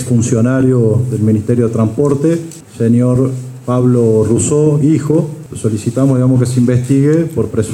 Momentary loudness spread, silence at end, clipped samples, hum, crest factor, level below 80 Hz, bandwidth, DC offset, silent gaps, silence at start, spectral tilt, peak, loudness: 7 LU; 0 s; under 0.1%; none; 12 dB; -44 dBFS; 13 kHz; under 0.1%; none; 0 s; -8 dB/octave; 0 dBFS; -13 LUFS